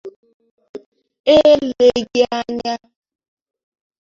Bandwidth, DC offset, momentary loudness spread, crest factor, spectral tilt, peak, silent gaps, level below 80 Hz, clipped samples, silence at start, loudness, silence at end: 7.4 kHz; under 0.1%; 13 LU; 16 dB; -4.5 dB/octave; -2 dBFS; 0.16-0.23 s, 0.34-0.40 s, 0.51-0.58 s, 0.69-0.74 s, 0.86-0.92 s, 1.20-1.24 s; -52 dBFS; under 0.1%; 0.05 s; -15 LUFS; 1.3 s